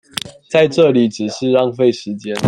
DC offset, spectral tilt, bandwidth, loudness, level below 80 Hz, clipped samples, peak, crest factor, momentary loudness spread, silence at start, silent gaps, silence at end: under 0.1%; -5.5 dB/octave; 16 kHz; -15 LUFS; -60 dBFS; under 0.1%; 0 dBFS; 16 dB; 13 LU; 0.25 s; none; 0 s